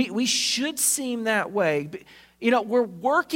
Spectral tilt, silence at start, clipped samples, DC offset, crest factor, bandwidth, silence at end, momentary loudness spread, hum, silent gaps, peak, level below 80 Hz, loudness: -2 dB/octave; 0 s; under 0.1%; under 0.1%; 16 dB; 16.5 kHz; 0 s; 6 LU; none; none; -8 dBFS; -68 dBFS; -23 LUFS